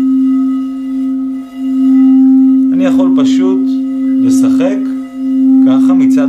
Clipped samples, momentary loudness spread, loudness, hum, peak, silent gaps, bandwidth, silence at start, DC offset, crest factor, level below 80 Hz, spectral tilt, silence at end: under 0.1%; 10 LU; -10 LUFS; none; -2 dBFS; none; 10 kHz; 0 s; under 0.1%; 8 dB; -54 dBFS; -6 dB/octave; 0 s